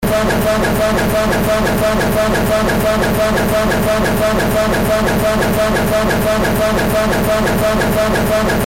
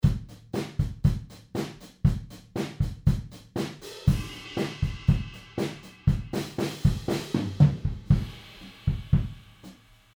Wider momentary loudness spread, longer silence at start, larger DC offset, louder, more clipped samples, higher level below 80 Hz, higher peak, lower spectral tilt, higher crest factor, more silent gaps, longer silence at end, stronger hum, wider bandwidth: second, 0 LU vs 11 LU; about the same, 0 s vs 0.05 s; neither; first, -14 LUFS vs -29 LUFS; neither; first, -26 dBFS vs -36 dBFS; about the same, -6 dBFS vs -6 dBFS; second, -5 dB/octave vs -7 dB/octave; second, 8 dB vs 22 dB; neither; second, 0 s vs 0.45 s; neither; second, 17 kHz vs over 20 kHz